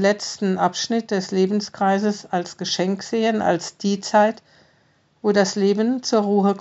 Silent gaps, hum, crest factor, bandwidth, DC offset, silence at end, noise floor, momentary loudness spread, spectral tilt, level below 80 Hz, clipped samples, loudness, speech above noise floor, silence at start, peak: none; none; 18 dB; 8 kHz; under 0.1%; 0 s; -60 dBFS; 6 LU; -4.5 dB/octave; -72 dBFS; under 0.1%; -21 LUFS; 40 dB; 0 s; -4 dBFS